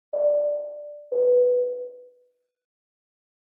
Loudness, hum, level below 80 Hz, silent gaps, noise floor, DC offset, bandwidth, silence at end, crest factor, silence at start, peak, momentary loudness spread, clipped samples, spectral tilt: -23 LUFS; none; under -90 dBFS; none; -66 dBFS; under 0.1%; 1.5 kHz; 1.4 s; 12 dB; 0.15 s; -12 dBFS; 18 LU; under 0.1%; -9.5 dB/octave